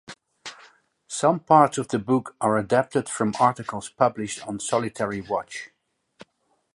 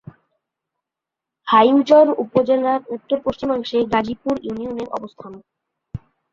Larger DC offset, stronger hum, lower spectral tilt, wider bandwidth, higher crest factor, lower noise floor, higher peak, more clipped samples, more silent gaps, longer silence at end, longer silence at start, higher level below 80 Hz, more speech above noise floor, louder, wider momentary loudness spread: neither; neither; second, -5 dB/octave vs -6.5 dB/octave; first, 11.5 kHz vs 7.4 kHz; about the same, 22 dB vs 18 dB; second, -71 dBFS vs -85 dBFS; about the same, -4 dBFS vs -2 dBFS; neither; neither; first, 1.1 s vs 0.35 s; second, 0.1 s vs 1.45 s; second, -62 dBFS vs -52 dBFS; second, 48 dB vs 67 dB; second, -23 LUFS vs -18 LUFS; second, 19 LU vs 23 LU